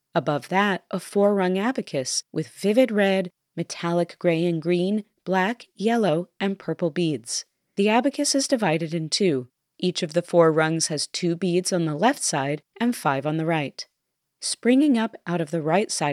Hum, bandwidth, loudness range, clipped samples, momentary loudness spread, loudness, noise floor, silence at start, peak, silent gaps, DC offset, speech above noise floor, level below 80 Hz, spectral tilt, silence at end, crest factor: none; 15 kHz; 2 LU; under 0.1%; 9 LU; -23 LUFS; -79 dBFS; 0.15 s; -6 dBFS; none; under 0.1%; 56 dB; -82 dBFS; -4.5 dB/octave; 0 s; 18 dB